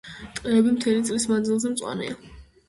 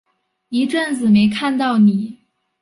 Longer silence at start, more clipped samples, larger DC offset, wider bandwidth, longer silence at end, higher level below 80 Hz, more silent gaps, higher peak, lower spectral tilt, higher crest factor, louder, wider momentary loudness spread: second, 0.05 s vs 0.5 s; neither; neither; about the same, 11.5 kHz vs 11.5 kHz; second, 0.25 s vs 0.5 s; about the same, -54 dBFS vs -58 dBFS; neither; about the same, -8 dBFS vs -6 dBFS; second, -4.5 dB/octave vs -6 dB/octave; about the same, 16 dB vs 12 dB; second, -24 LUFS vs -16 LUFS; first, 14 LU vs 10 LU